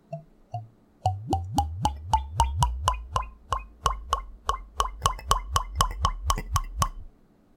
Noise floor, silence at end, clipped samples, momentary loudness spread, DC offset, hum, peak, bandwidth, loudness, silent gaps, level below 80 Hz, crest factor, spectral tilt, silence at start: -55 dBFS; 0.5 s; under 0.1%; 8 LU; under 0.1%; none; -2 dBFS; 17 kHz; -29 LUFS; none; -34 dBFS; 28 dB; -4 dB/octave; 0.1 s